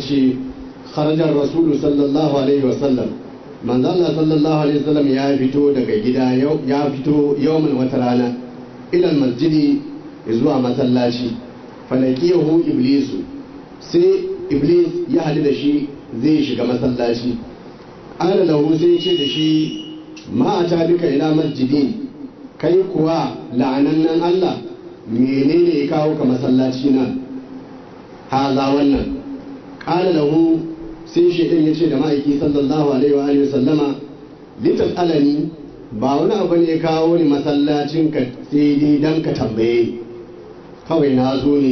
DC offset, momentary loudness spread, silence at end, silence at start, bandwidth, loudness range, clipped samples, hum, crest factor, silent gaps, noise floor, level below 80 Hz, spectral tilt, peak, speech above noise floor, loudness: under 0.1%; 16 LU; 0 s; 0 s; 6.4 kHz; 2 LU; under 0.1%; none; 12 dB; none; -37 dBFS; -48 dBFS; -7.5 dB/octave; -4 dBFS; 22 dB; -17 LUFS